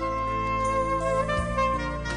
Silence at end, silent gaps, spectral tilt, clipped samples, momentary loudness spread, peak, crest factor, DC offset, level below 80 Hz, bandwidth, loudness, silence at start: 0 s; none; -5.5 dB/octave; under 0.1%; 2 LU; -14 dBFS; 12 dB; under 0.1%; -36 dBFS; 10 kHz; -26 LUFS; 0 s